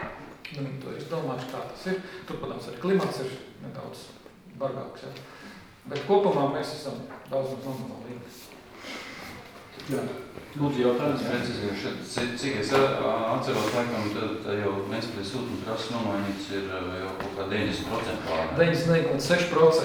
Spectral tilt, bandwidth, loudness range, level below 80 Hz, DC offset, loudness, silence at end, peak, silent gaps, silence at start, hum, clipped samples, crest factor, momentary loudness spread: -5.5 dB/octave; over 20 kHz; 7 LU; -56 dBFS; under 0.1%; -28 LUFS; 0 s; -8 dBFS; none; 0 s; none; under 0.1%; 20 dB; 18 LU